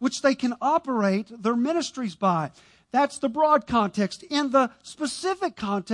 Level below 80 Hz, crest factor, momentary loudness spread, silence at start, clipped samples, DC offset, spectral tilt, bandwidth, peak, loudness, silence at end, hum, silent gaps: -60 dBFS; 16 dB; 7 LU; 0 s; under 0.1%; under 0.1%; -5 dB/octave; 11.5 kHz; -8 dBFS; -25 LUFS; 0 s; none; none